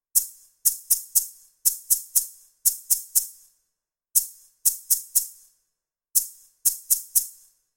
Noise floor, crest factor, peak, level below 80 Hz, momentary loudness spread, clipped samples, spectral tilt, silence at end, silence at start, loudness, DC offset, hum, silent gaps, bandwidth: -82 dBFS; 26 dB; 0 dBFS; -62 dBFS; 15 LU; under 0.1%; 4.5 dB/octave; 0.45 s; 0.15 s; -22 LUFS; under 0.1%; none; none; 17 kHz